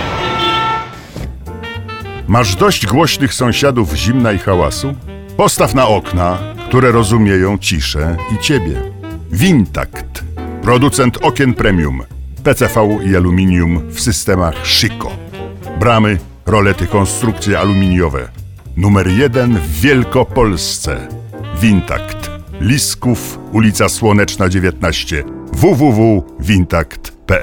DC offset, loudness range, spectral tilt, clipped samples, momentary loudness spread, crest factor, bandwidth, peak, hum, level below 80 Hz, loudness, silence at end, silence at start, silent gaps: under 0.1%; 2 LU; -5 dB/octave; under 0.1%; 14 LU; 12 dB; 17.5 kHz; 0 dBFS; none; -28 dBFS; -13 LUFS; 0 s; 0 s; none